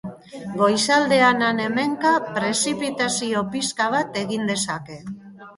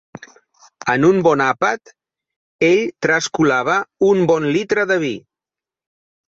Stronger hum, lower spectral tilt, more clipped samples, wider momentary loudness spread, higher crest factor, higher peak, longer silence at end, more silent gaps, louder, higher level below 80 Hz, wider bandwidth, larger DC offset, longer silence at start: neither; second, -3 dB/octave vs -5 dB/octave; neither; first, 19 LU vs 6 LU; about the same, 18 dB vs 16 dB; about the same, -4 dBFS vs -2 dBFS; second, 0.05 s vs 1.1 s; second, none vs 2.36-2.59 s; second, -21 LUFS vs -16 LUFS; about the same, -62 dBFS vs -58 dBFS; first, 11.5 kHz vs 8 kHz; neither; second, 0.05 s vs 0.85 s